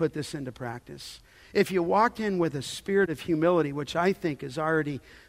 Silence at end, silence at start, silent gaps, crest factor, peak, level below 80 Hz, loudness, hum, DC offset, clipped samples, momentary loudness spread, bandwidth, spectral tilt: 0.1 s; 0 s; none; 18 dB; -10 dBFS; -58 dBFS; -27 LUFS; none; under 0.1%; under 0.1%; 14 LU; 16 kHz; -6 dB/octave